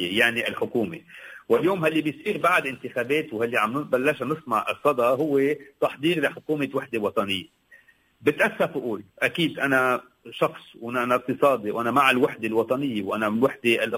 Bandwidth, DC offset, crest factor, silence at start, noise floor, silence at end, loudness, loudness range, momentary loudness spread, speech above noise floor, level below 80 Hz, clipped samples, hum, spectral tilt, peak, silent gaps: 16 kHz; under 0.1%; 20 dB; 0 s; -56 dBFS; 0 s; -24 LUFS; 3 LU; 8 LU; 32 dB; -64 dBFS; under 0.1%; none; -5 dB/octave; -6 dBFS; none